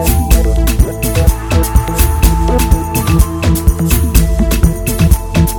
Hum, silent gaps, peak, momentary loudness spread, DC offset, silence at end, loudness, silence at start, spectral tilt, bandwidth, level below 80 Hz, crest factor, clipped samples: none; none; 0 dBFS; 2 LU; under 0.1%; 0 s; -12 LUFS; 0 s; -5.5 dB/octave; 19.5 kHz; -12 dBFS; 10 dB; 0.4%